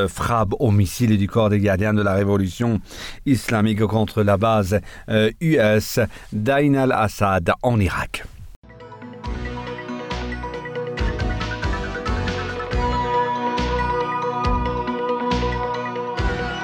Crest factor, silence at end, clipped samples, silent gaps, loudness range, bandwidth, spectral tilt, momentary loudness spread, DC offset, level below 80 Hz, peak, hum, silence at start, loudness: 14 dB; 0 s; under 0.1%; 8.56-8.62 s; 8 LU; 19 kHz; -6.5 dB/octave; 11 LU; under 0.1%; -34 dBFS; -6 dBFS; none; 0 s; -21 LUFS